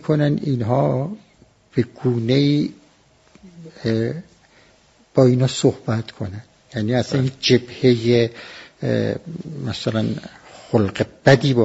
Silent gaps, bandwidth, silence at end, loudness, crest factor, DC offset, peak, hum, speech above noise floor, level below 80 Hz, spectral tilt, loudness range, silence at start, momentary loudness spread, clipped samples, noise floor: none; 8 kHz; 0 s; -20 LUFS; 20 dB; under 0.1%; 0 dBFS; none; 36 dB; -54 dBFS; -6 dB/octave; 3 LU; 0.05 s; 16 LU; under 0.1%; -55 dBFS